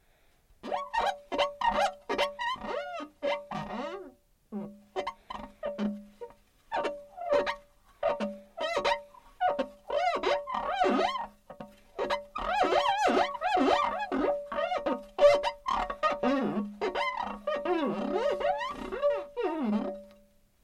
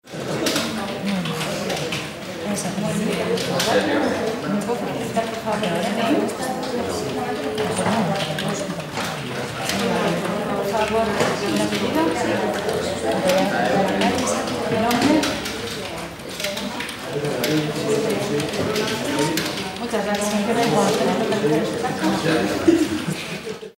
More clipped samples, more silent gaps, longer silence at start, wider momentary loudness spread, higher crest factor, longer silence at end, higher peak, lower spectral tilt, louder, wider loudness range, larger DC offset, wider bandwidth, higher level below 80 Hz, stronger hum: neither; neither; first, 0.65 s vs 0.05 s; first, 14 LU vs 8 LU; about the same, 20 dB vs 18 dB; first, 0.5 s vs 0.1 s; second, -10 dBFS vs -4 dBFS; about the same, -4.5 dB/octave vs -4.5 dB/octave; second, -30 LUFS vs -22 LUFS; first, 9 LU vs 3 LU; neither; second, 12.5 kHz vs 16.5 kHz; second, -58 dBFS vs -50 dBFS; neither